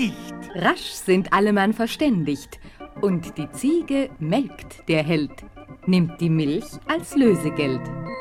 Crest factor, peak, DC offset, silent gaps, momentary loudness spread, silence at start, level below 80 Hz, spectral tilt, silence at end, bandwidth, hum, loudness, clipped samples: 18 dB; -4 dBFS; under 0.1%; none; 13 LU; 0 s; -50 dBFS; -6 dB/octave; 0 s; 16.5 kHz; none; -22 LUFS; under 0.1%